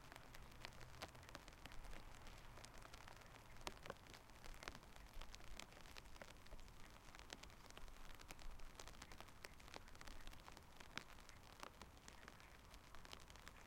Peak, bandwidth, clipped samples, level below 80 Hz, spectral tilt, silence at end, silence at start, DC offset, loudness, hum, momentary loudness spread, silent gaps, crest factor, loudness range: -22 dBFS; 16.5 kHz; under 0.1%; -62 dBFS; -3 dB/octave; 0 s; 0 s; under 0.1%; -60 LUFS; none; 6 LU; none; 34 dB; 2 LU